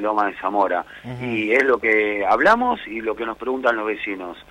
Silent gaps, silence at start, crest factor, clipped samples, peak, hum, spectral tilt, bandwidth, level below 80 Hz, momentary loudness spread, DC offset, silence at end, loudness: none; 0 s; 16 dB; under 0.1%; -6 dBFS; none; -5.5 dB/octave; 12 kHz; -54 dBFS; 11 LU; under 0.1%; 0.1 s; -20 LUFS